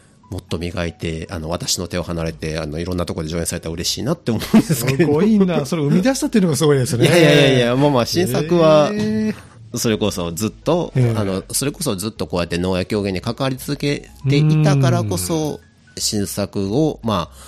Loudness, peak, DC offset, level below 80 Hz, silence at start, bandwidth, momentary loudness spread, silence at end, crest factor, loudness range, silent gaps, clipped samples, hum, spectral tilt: -18 LUFS; -2 dBFS; under 0.1%; -42 dBFS; 0.3 s; 15.5 kHz; 10 LU; 0 s; 16 dB; 8 LU; none; under 0.1%; none; -5.5 dB/octave